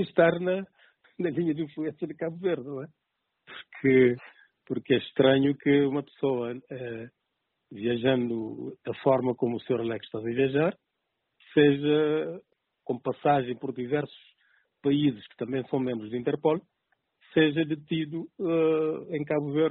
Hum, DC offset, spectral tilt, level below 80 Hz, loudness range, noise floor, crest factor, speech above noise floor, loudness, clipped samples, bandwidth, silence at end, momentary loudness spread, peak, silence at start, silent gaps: none; under 0.1%; -5.5 dB/octave; -68 dBFS; 4 LU; -81 dBFS; 20 dB; 54 dB; -27 LUFS; under 0.1%; 4.2 kHz; 0 s; 14 LU; -8 dBFS; 0 s; none